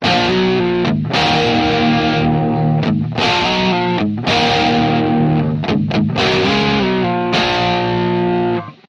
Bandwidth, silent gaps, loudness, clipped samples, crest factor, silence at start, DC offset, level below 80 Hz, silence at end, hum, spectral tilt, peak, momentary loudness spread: 8.6 kHz; none; -15 LUFS; under 0.1%; 12 dB; 0 s; under 0.1%; -40 dBFS; 0.15 s; none; -6 dB/octave; -2 dBFS; 3 LU